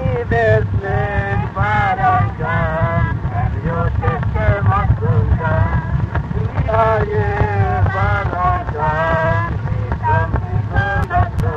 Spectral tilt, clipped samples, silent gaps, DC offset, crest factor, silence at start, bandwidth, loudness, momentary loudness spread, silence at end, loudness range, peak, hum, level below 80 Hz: -9 dB/octave; under 0.1%; none; under 0.1%; 14 dB; 0 s; 6.2 kHz; -17 LUFS; 5 LU; 0 s; 1 LU; -2 dBFS; none; -24 dBFS